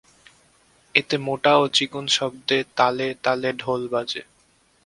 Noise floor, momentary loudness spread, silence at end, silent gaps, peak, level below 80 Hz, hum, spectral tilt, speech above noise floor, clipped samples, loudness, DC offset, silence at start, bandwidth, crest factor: -61 dBFS; 8 LU; 0.65 s; none; 0 dBFS; -64 dBFS; none; -3.5 dB/octave; 39 dB; under 0.1%; -22 LUFS; under 0.1%; 0.95 s; 11.5 kHz; 22 dB